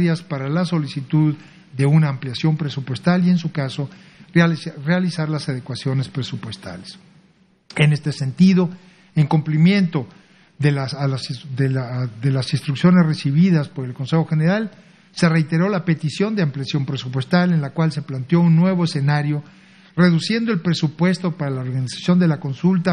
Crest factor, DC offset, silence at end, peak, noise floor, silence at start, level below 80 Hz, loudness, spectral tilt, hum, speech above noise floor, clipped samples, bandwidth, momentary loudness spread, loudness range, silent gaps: 18 dB; under 0.1%; 0 s; -2 dBFS; -56 dBFS; 0 s; -60 dBFS; -19 LUFS; -7 dB/octave; none; 38 dB; under 0.1%; 10 kHz; 11 LU; 4 LU; none